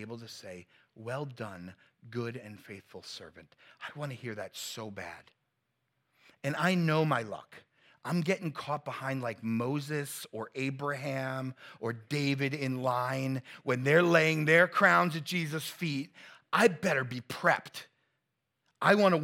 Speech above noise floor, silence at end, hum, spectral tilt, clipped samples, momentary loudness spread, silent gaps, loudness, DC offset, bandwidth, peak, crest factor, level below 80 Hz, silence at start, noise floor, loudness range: 51 dB; 0 s; none; -5.5 dB/octave; under 0.1%; 21 LU; none; -30 LUFS; under 0.1%; 17 kHz; -10 dBFS; 22 dB; -80 dBFS; 0 s; -83 dBFS; 16 LU